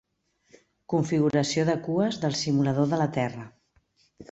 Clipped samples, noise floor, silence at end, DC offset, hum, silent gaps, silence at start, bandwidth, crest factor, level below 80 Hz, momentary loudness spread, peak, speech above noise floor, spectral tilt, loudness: under 0.1%; -69 dBFS; 0.1 s; under 0.1%; none; none; 0.9 s; 8.2 kHz; 18 dB; -62 dBFS; 7 LU; -10 dBFS; 44 dB; -6 dB/octave; -26 LUFS